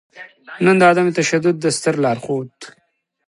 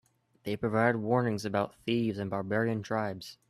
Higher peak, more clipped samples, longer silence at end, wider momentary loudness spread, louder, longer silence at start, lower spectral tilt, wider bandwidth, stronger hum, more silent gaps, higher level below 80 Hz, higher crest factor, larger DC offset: first, 0 dBFS vs -12 dBFS; neither; first, 0.6 s vs 0.15 s; first, 13 LU vs 8 LU; first, -16 LUFS vs -31 LUFS; second, 0.15 s vs 0.45 s; second, -5 dB/octave vs -6.5 dB/octave; second, 11.5 kHz vs 13.5 kHz; neither; neither; about the same, -64 dBFS vs -66 dBFS; about the same, 18 dB vs 20 dB; neither